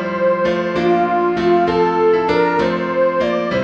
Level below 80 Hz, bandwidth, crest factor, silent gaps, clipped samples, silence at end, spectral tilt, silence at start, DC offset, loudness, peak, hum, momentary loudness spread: -46 dBFS; 7.2 kHz; 12 dB; none; under 0.1%; 0 s; -7 dB/octave; 0 s; 0.1%; -16 LUFS; -2 dBFS; none; 3 LU